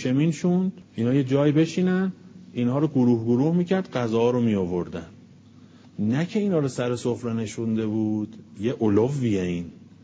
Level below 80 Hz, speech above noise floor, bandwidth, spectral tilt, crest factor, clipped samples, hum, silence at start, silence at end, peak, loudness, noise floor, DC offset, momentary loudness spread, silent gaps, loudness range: -56 dBFS; 27 dB; 8 kHz; -7.5 dB/octave; 16 dB; under 0.1%; none; 0 s; 0.3 s; -8 dBFS; -24 LUFS; -50 dBFS; under 0.1%; 9 LU; none; 4 LU